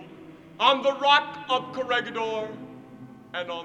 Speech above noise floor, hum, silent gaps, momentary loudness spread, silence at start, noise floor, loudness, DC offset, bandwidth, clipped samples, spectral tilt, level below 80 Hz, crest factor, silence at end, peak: 21 dB; none; none; 22 LU; 0 s; -46 dBFS; -24 LUFS; under 0.1%; 9 kHz; under 0.1%; -3.5 dB/octave; -72 dBFS; 22 dB; 0 s; -6 dBFS